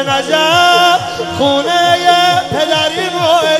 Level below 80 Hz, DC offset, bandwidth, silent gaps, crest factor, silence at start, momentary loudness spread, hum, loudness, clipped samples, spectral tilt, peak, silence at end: -50 dBFS; under 0.1%; 15.5 kHz; none; 12 dB; 0 s; 6 LU; none; -11 LUFS; under 0.1%; -3 dB/octave; 0 dBFS; 0 s